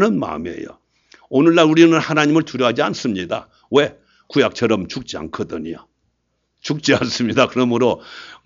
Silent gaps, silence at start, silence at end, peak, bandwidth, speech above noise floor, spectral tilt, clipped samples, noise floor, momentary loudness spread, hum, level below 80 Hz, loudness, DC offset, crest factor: none; 0 s; 0.1 s; 0 dBFS; 7.6 kHz; 52 dB; -5.5 dB/octave; under 0.1%; -69 dBFS; 16 LU; none; -54 dBFS; -17 LUFS; under 0.1%; 18 dB